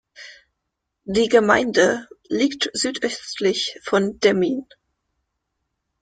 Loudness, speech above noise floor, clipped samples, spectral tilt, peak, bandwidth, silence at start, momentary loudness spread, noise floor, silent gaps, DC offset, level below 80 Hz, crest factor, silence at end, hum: -20 LUFS; 59 dB; under 0.1%; -3.5 dB/octave; -2 dBFS; 9.4 kHz; 0.2 s; 13 LU; -79 dBFS; none; under 0.1%; -58 dBFS; 20 dB; 1.4 s; none